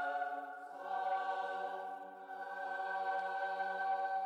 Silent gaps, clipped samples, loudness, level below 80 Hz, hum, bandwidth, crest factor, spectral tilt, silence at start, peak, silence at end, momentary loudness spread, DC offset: none; under 0.1%; -40 LUFS; under -90 dBFS; none; 9 kHz; 12 dB; -3.5 dB/octave; 0 s; -28 dBFS; 0 s; 10 LU; under 0.1%